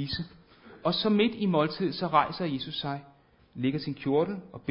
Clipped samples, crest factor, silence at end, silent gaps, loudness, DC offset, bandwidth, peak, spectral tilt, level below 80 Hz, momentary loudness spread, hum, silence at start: under 0.1%; 20 dB; 0 s; none; -29 LUFS; under 0.1%; 5.6 kHz; -8 dBFS; -10 dB/octave; -60 dBFS; 11 LU; none; 0 s